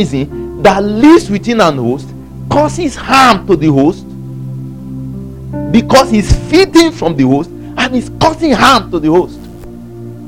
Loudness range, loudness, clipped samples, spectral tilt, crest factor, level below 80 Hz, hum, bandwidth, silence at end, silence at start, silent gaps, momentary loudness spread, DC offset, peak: 3 LU; -10 LUFS; 1%; -5.5 dB/octave; 10 dB; -28 dBFS; none; 16.5 kHz; 0 s; 0 s; none; 18 LU; 0.8%; 0 dBFS